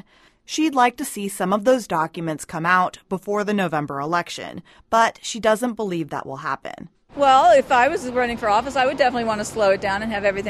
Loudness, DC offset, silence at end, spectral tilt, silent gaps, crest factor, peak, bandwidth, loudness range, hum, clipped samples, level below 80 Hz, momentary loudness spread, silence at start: -20 LUFS; under 0.1%; 0 s; -4.5 dB/octave; none; 18 dB; -4 dBFS; 13 kHz; 5 LU; none; under 0.1%; -52 dBFS; 13 LU; 0.5 s